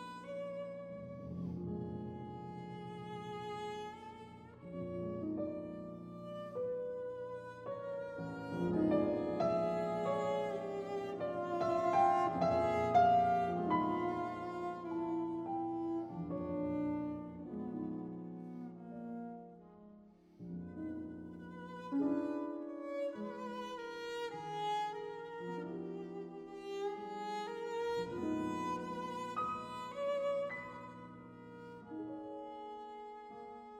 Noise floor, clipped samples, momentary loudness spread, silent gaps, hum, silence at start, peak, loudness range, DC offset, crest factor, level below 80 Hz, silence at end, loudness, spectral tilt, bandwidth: -61 dBFS; under 0.1%; 16 LU; none; none; 0 s; -18 dBFS; 13 LU; under 0.1%; 20 dB; -70 dBFS; 0 s; -39 LUFS; -7 dB/octave; 11.5 kHz